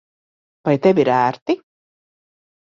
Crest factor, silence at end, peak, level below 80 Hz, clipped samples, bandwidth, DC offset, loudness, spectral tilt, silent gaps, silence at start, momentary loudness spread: 18 dB; 1.1 s; -2 dBFS; -62 dBFS; under 0.1%; 7.2 kHz; under 0.1%; -18 LUFS; -7.5 dB/octave; 1.42-1.46 s; 0.65 s; 10 LU